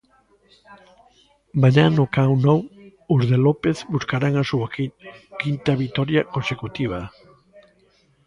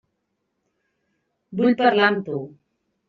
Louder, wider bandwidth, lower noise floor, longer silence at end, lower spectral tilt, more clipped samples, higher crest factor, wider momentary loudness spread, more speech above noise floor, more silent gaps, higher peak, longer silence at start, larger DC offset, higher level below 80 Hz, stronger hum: about the same, -21 LUFS vs -19 LUFS; first, 7.4 kHz vs 6 kHz; second, -59 dBFS vs -76 dBFS; first, 1.2 s vs 0.6 s; first, -7.5 dB/octave vs -3 dB/octave; neither; about the same, 18 dB vs 20 dB; second, 12 LU vs 16 LU; second, 40 dB vs 56 dB; neither; about the same, -4 dBFS vs -4 dBFS; second, 0.7 s vs 1.5 s; neither; first, -52 dBFS vs -68 dBFS; neither